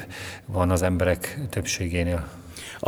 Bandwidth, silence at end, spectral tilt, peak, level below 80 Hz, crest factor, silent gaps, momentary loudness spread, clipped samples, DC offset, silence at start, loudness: over 20 kHz; 0 s; -5 dB/octave; -8 dBFS; -40 dBFS; 20 dB; none; 15 LU; under 0.1%; under 0.1%; 0 s; -26 LUFS